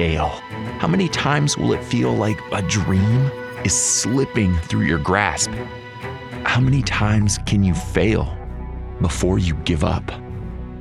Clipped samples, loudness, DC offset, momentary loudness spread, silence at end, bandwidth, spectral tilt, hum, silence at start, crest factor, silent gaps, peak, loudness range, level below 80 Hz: under 0.1%; -19 LUFS; under 0.1%; 14 LU; 0 s; 13.5 kHz; -4.5 dB/octave; none; 0 s; 18 dB; none; -2 dBFS; 2 LU; -32 dBFS